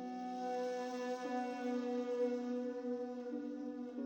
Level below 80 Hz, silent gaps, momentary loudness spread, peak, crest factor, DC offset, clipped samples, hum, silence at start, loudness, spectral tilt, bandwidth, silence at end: under -90 dBFS; none; 6 LU; -28 dBFS; 12 dB; under 0.1%; under 0.1%; none; 0 s; -41 LUFS; -5 dB/octave; 16.5 kHz; 0 s